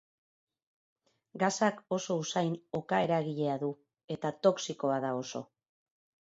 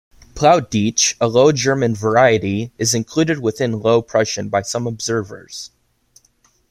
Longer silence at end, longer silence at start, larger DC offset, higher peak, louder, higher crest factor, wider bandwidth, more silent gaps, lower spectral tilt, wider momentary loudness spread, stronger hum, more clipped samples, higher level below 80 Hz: second, 0.85 s vs 1.05 s; first, 1.35 s vs 0.35 s; neither; second, -12 dBFS vs -2 dBFS; second, -32 LUFS vs -17 LUFS; first, 22 dB vs 16 dB; second, 8 kHz vs 15.5 kHz; first, 4.04-4.08 s vs none; about the same, -5 dB/octave vs -4 dB/octave; about the same, 11 LU vs 10 LU; neither; neither; second, -76 dBFS vs -50 dBFS